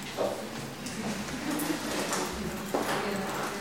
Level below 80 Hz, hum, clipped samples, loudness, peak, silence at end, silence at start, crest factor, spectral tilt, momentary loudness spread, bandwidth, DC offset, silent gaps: -54 dBFS; none; under 0.1%; -32 LUFS; -14 dBFS; 0 s; 0 s; 20 dB; -3.5 dB/octave; 6 LU; 17 kHz; 0.2%; none